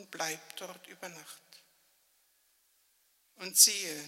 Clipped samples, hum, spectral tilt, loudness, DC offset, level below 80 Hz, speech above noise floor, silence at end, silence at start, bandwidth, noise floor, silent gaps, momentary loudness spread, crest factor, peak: under 0.1%; none; 1 dB/octave; -25 LUFS; under 0.1%; under -90 dBFS; 39 dB; 0 s; 0 s; 16 kHz; -71 dBFS; none; 25 LU; 30 dB; -6 dBFS